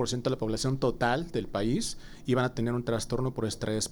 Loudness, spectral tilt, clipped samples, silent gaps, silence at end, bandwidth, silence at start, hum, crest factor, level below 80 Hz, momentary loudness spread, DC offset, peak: -30 LUFS; -5 dB/octave; under 0.1%; none; 0 s; over 20 kHz; 0 s; none; 18 dB; -46 dBFS; 4 LU; under 0.1%; -12 dBFS